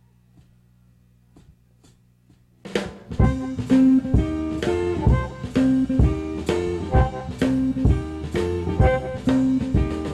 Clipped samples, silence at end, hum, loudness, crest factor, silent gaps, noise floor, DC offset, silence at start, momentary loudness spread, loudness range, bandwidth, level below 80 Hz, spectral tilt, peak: under 0.1%; 0 s; 60 Hz at -40 dBFS; -22 LUFS; 18 dB; none; -56 dBFS; under 0.1%; 2.65 s; 8 LU; 8 LU; 11 kHz; -30 dBFS; -8 dB/octave; -4 dBFS